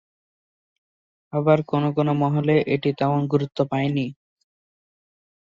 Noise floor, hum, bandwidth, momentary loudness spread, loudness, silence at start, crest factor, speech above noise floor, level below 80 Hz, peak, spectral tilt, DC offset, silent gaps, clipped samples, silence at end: under -90 dBFS; none; 7.2 kHz; 5 LU; -22 LUFS; 1.35 s; 20 dB; over 69 dB; -62 dBFS; -4 dBFS; -9 dB/octave; under 0.1%; none; under 0.1%; 1.35 s